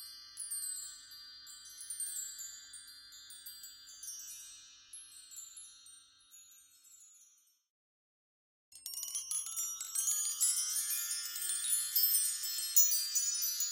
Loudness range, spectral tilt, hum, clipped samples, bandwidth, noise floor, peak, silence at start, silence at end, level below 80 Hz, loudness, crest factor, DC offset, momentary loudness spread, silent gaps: 22 LU; 5.5 dB/octave; none; under 0.1%; 16.5 kHz; -68 dBFS; -12 dBFS; 0 s; 0 s; -84 dBFS; -32 LUFS; 28 dB; under 0.1%; 22 LU; 7.70-8.72 s